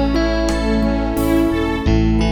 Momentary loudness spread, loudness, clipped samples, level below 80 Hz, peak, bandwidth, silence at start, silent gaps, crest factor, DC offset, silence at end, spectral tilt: 3 LU; -17 LUFS; under 0.1%; -22 dBFS; -4 dBFS; over 20 kHz; 0 s; none; 12 dB; under 0.1%; 0 s; -6.5 dB/octave